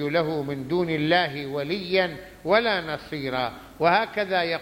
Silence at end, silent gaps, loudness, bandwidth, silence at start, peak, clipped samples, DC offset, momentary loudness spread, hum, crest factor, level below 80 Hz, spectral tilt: 0 s; none; -25 LUFS; 16.5 kHz; 0 s; -6 dBFS; under 0.1%; under 0.1%; 9 LU; none; 18 dB; -56 dBFS; -6 dB/octave